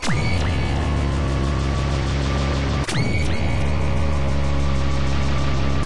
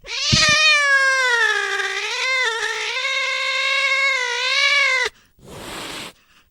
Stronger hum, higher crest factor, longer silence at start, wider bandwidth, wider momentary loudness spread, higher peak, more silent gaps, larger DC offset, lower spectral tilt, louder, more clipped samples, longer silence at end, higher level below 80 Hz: neither; second, 10 dB vs 20 dB; about the same, 0 s vs 0.05 s; second, 11.5 kHz vs 17.5 kHz; second, 1 LU vs 18 LU; second, -8 dBFS vs 0 dBFS; neither; neither; first, -6 dB/octave vs -1 dB/octave; second, -22 LUFS vs -16 LUFS; neither; second, 0 s vs 0.4 s; first, -26 dBFS vs -48 dBFS